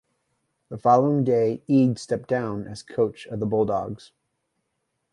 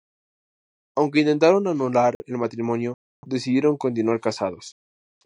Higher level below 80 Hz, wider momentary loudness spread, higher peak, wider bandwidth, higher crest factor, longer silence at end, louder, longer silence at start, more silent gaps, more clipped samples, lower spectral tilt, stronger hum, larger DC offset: first, -60 dBFS vs -70 dBFS; about the same, 14 LU vs 13 LU; about the same, -6 dBFS vs -4 dBFS; about the same, 11 kHz vs 10.5 kHz; about the same, 18 dB vs 20 dB; first, 1.15 s vs 0.55 s; about the same, -23 LUFS vs -22 LUFS; second, 0.7 s vs 0.95 s; second, none vs 2.15-2.20 s, 2.94-3.23 s; neither; first, -8 dB/octave vs -6.5 dB/octave; neither; neither